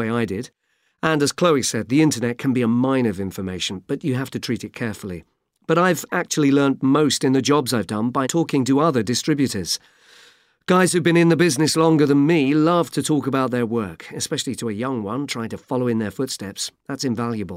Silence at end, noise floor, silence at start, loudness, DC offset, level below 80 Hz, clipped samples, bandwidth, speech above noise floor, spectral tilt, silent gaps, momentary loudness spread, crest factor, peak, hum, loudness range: 0 s; -53 dBFS; 0 s; -20 LUFS; under 0.1%; -60 dBFS; under 0.1%; 16 kHz; 33 dB; -5 dB/octave; none; 11 LU; 16 dB; -4 dBFS; none; 6 LU